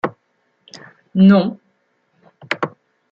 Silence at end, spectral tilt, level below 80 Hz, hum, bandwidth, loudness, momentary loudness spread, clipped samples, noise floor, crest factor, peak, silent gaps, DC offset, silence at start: 0.45 s; -8.5 dB/octave; -62 dBFS; none; 7 kHz; -16 LUFS; 15 LU; under 0.1%; -65 dBFS; 18 dB; -2 dBFS; none; under 0.1%; 0.05 s